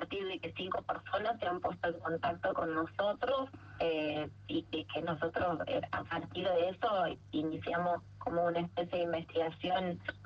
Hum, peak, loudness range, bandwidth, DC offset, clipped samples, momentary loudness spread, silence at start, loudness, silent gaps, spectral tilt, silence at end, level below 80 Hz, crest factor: none; -20 dBFS; 1 LU; 6.8 kHz; under 0.1%; under 0.1%; 5 LU; 0 s; -36 LUFS; none; -7.5 dB/octave; 0 s; -64 dBFS; 14 dB